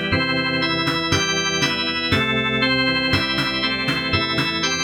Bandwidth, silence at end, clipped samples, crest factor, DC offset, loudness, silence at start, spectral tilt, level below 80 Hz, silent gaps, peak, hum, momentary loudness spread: 18.5 kHz; 0 s; under 0.1%; 16 dB; under 0.1%; -19 LUFS; 0 s; -3.5 dB/octave; -44 dBFS; none; -4 dBFS; none; 2 LU